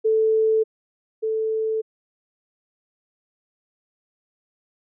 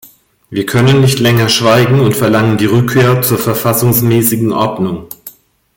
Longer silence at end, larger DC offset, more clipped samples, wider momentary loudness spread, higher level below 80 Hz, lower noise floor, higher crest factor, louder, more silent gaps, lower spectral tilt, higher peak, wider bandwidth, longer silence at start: first, 3.05 s vs 0.45 s; neither; neither; about the same, 12 LU vs 10 LU; second, under -90 dBFS vs -44 dBFS; first, under -90 dBFS vs -37 dBFS; about the same, 12 dB vs 12 dB; second, -23 LUFS vs -10 LUFS; first, 0.64-1.22 s vs none; first, -8.5 dB/octave vs -5.5 dB/octave; second, -16 dBFS vs 0 dBFS; second, 0.5 kHz vs 17 kHz; second, 0.05 s vs 0.5 s